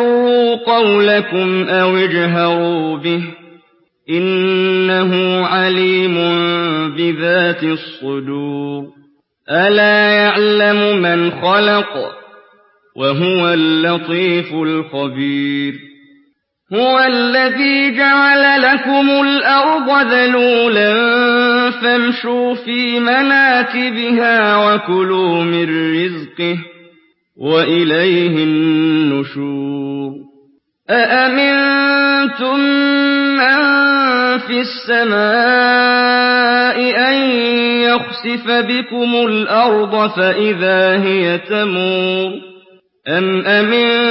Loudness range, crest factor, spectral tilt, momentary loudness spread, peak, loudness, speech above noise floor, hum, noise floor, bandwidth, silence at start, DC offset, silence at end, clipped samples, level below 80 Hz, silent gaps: 5 LU; 12 dB; -10 dB/octave; 9 LU; 0 dBFS; -13 LUFS; 45 dB; none; -58 dBFS; 5.8 kHz; 0 s; under 0.1%; 0 s; under 0.1%; -68 dBFS; none